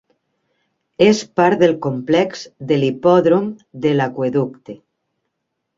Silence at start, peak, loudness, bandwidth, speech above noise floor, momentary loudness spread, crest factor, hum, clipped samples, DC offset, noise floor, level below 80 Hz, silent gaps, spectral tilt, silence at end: 1 s; -2 dBFS; -17 LUFS; 7.8 kHz; 59 dB; 13 LU; 16 dB; none; under 0.1%; under 0.1%; -75 dBFS; -60 dBFS; none; -6.5 dB/octave; 1.05 s